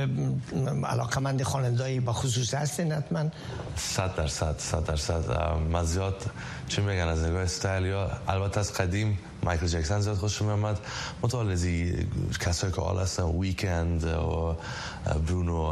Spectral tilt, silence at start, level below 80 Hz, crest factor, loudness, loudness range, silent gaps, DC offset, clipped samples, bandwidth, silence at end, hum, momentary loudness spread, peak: -5 dB/octave; 0 s; -38 dBFS; 18 dB; -29 LUFS; 1 LU; none; under 0.1%; under 0.1%; 13 kHz; 0 s; none; 4 LU; -10 dBFS